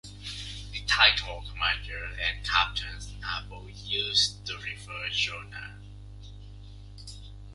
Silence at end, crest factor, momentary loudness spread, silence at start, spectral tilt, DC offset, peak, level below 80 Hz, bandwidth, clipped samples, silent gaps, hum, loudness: 0 s; 26 dB; 25 LU; 0.05 s; -1 dB/octave; under 0.1%; -6 dBFS; -44 dBFS; 11.5 kHz; under 0.1%; none; 50 Hz at -45 dBFS; -27 LUFS